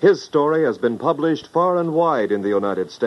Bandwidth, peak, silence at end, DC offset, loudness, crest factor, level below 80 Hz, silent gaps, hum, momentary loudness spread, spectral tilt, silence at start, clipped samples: 11 kHz; -4 dBFS; 0 s; under 0.1%; -19 LUFS; 16 dB; -64 dBFS; none; none; 3 LU; -7 dB/octave; 0 s; under 0.1%